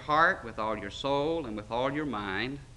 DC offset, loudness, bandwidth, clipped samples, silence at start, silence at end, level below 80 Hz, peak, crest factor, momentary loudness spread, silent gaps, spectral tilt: under 0.1%; -30 LUFS; 11.5 kHz; under 0.1%; 0 s; 0 s; -52 dBFS; -12 dBFS; 20 dB; 9 LU; none; -5.5 dB/octave